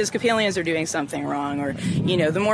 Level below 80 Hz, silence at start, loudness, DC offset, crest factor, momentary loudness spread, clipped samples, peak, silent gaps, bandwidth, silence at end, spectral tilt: -54 dBFS; 0 s; -23 LUFS; under 0.1%; 16 dB; 6 LU; under 0.1%; -8 dBFS; none; 11 kHz; 0 s; -4.5 dB/octave